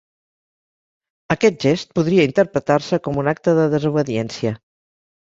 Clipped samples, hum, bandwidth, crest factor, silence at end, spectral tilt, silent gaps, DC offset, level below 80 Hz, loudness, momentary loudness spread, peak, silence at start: under 0.1%; none; 7.8 kHz; 18 dB; 0.65 s; -6.5 dB/octave; none; under 0.1%; -54 dBFS; -19 LUFS; 8 LU; -2 dBFS; 1.3 s